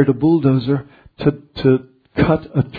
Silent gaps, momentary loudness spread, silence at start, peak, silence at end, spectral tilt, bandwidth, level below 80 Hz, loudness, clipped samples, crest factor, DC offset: none; 7 LU; 0 s; 0 dBFS; 0 s; -11 dB/octave; 4.9 kHz; -42 dBFS; -18 LUFS; under 0.1%; 16 dB; under 0.1%